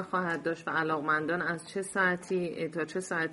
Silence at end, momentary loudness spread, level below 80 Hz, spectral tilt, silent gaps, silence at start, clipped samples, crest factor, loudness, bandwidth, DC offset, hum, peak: 0 s; 6 LU; -72 dBFS; -5 dB/octave; none; 0 s; under 0.1%; 16 dB; -31 LUFS; 11.5 kHz; under 0.1%; none; -14 dBFS